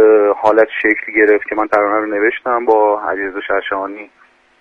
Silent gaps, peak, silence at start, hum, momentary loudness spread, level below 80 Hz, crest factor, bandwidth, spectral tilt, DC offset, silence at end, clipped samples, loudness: none; 0 dBFS; 0 s; none; 9 LU; -54 dBFS; 14 dB; 5 kHz; -6 dB/octave; under 0.1%; 0.55 s; under 0.1%; -14 LUFS